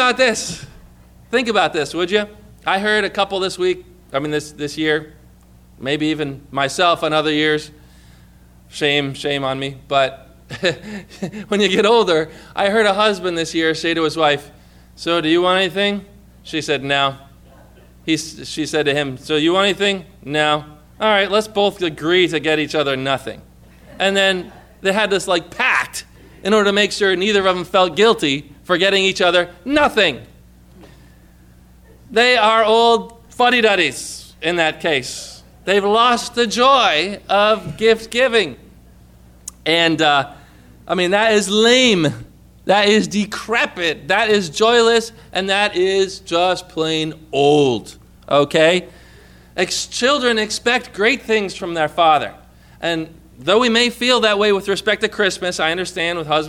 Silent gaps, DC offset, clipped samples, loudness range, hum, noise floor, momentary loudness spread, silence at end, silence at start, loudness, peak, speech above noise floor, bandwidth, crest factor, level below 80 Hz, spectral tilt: none; under 0.1%; under 0.1%; 4 LU; 60 Hz at -45 dBFS; -46 dBFS; 12 LU; 0 s; 0 s; -17 LUFS; -2 dBFS; 29 dB; 15.5 kHz; 16 dB; -48 dBFS; -3.5 dB/octave